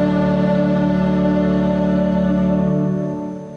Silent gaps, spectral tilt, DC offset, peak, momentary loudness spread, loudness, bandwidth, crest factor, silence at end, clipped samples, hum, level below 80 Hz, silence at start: none; -9.5 dB/octave; under 0.1%; -6 dBFS; 4 LU; -17 LUFS; 6.6 kHz; 10 dB; 0 s; under 0.1%; none; -36 dBFS; 0 s